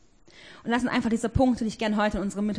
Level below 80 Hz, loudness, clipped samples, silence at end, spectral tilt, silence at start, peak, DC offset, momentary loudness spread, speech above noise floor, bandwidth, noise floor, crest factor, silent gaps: -44 dBFS; -26 LUFS; under 0.1%; 0 s; -6 dB/octave; 0.4 s; -10 dBFS; 0.1%; 5 LU; 27 dB; 10.5 kHz; -53 dBFS; 16 dB; none